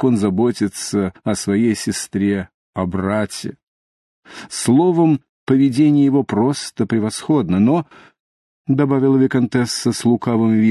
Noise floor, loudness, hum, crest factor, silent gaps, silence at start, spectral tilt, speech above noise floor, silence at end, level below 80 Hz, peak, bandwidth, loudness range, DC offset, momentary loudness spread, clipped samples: under -90 dBFS; -17 LUFS; none; 14 dB; 2.54-2.73 s, 3.63-4.23 s, 5.29-5.47 s, 8.20-8.65 s; 0 s; -6 dB/octave; over 74 dB; 0 s; -48 dBFS; -2 dBFS; 12.5 kHz; 5 LU; under 0.1%; 10 LU; under 0.1%